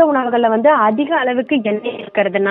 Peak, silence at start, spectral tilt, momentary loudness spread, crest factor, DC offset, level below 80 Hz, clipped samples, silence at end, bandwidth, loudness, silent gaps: 0 dBFS; 0 s; -9.5 dB/octave; 8 LU; 14 dB; under 0.1%; -66 dBFS; under 0.1%; 0 s; 4 kHz; -15 LUFS; none